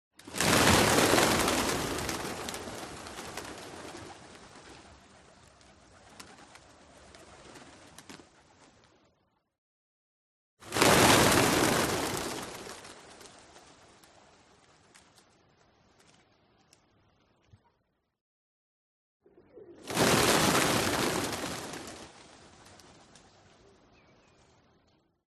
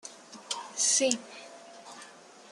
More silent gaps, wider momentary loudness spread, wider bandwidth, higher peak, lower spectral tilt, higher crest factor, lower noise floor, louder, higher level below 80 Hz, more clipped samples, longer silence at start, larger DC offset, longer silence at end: first, 9.58-10.57 s, 18.21-19.20 s vs none; first, 28 LU vs 24 LU; about the same, 13 kHz vs 13 kHz; about the same, -4 dBFS vs -6 dBFS; first, -3 dB/octave vs 0 dB/octave; about the same, 30 dB vs 28 dB; first, -77 dBFS vs -52 dBFS; about the same, -26 LUFS vs -28 LUFS; first, -56 dBFS vs -84 dBFS; neither; first, 0.25 s vs 0.05 s; neither; first, 3.25 s vs 0.4 s